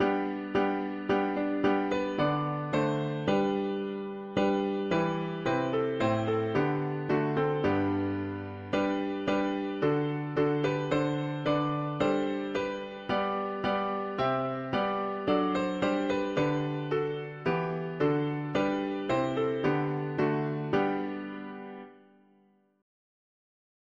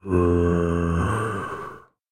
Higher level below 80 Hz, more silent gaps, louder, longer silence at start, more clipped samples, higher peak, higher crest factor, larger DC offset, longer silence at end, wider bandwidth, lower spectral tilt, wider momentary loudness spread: second, -60 dBFS vs -36 dBFS; neither; second, -30 LUFS vs -23 LUFS; about the same, 0 s vs 0.05 s; neither; second, -14 dBFS vs -8 dBFS; about the same, 16 dB vs 16 dB; neither; first, 1.85 s vs 0.3 s; second, 7.4 kHz vs 10 kHz; about the same, -7.5 dB/octave vs -8 dB/octave; second, 5 LU vs 14 LU